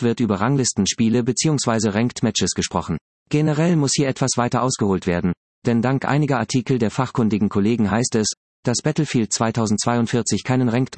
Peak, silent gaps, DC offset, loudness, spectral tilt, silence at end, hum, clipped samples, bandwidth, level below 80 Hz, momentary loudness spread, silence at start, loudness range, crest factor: -4 dBFS; 3.01-3.26 s, 5.37-5.62 s, 8.37-8.63 s; under 0.1%; -20 LUFS; -5 dB/octave; 0 s; none; under 0.1%; 8.8 kHz; -54 dBFS; 4 LU; 0 s; 1 LU; 16 dB